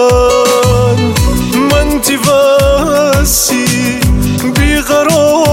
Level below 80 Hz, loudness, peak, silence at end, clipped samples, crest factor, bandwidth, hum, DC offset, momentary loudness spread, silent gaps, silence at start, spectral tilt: -18 dBFS; -9 LUFS; 0 dBFS; 0 s; under 0.1%; 8 dB; 17 kHz; none; under 0.1%; 4 LU; none; 0 s; -4.5 dB/octave